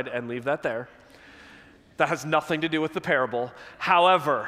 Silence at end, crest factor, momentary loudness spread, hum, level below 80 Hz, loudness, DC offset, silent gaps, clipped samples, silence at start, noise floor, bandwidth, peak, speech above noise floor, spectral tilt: 0 s; 20 dB; 12 LU; none; -66 dBFS; -25 LUFS; under 0.1%; none; under 0.1%; 0 s; -52 dBFS; 15.5 kHz; -6 dBFS; 27 dB; -5 dB/octave